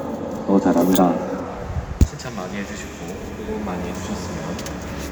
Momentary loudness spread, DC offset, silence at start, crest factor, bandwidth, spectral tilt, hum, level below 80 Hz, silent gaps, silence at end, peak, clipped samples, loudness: 14 LU; under 0.1%; 0 s; 22 dB; over 20 kHz; -6 dB/octave; none; -32 dBFS; none; 0 s; 0 dBFS; under 0.1%; -23 LUFS